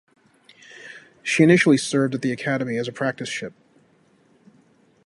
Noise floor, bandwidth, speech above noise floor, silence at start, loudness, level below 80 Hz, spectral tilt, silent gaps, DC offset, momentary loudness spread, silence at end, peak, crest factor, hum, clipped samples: -59 dBFS; 11.5 kHz; 39 dB; 0.8 s; -21 LUFS; -68 dBFS; -5.5 dB/octave; none; under 0.1%; 25 LU; 1.55 s; -2 dBFS; 22 dB; none; under 0.1%